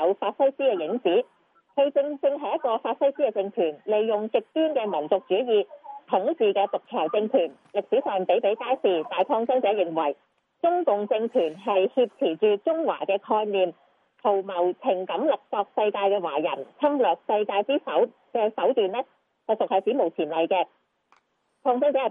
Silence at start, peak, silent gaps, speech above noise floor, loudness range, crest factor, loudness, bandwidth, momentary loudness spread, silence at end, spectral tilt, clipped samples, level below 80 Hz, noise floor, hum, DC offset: 0 s; -8 dBFS; none; 44 dB; 1 LU; 16 dB; -25 LUFS; 3.8 kHz; 5 LU; 0 s; -7.5 dB/octave; under 0.1%; under -90 dBFS; -68 dBFS; none; under 0.1%